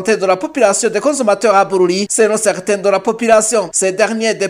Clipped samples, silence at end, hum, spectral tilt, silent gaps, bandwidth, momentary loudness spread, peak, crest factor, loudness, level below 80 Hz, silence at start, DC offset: under 0.1%; 0 s; none; -3 dB/octave; none; 16 kHz; 4 LU; 0 dBFS; 14 dB; -13 LUFS; -58 dBFS; 0 s; under 0.1%